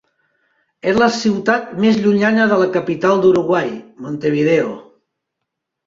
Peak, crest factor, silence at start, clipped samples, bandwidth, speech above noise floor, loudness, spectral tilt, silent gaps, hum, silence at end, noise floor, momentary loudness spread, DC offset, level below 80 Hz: -2 dBFS; 14 dB; 0.85 s; under 0.1%; 7.6 kHz; 63 dB; -16 LUFS; -6 dB/octave; none; none; 1.05 s; -78 dBFS; 11 LU; under 0.1%; -56 dBFS